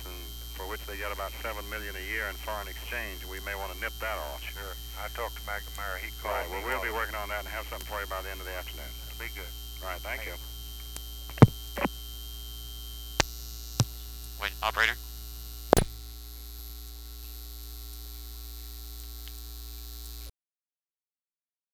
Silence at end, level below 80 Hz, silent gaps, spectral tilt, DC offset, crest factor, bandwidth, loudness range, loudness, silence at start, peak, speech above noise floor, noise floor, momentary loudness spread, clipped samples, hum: 1.45 s; -42 dBFS; none; -4.5 dB/octave; under 0.1%; 34 dB; over 20 kHz; 13 LU; -33 LUFS; 0 s; 0 dBFS; over 55 dB; under -90 dBFS; 16 LU; under 0.1%; none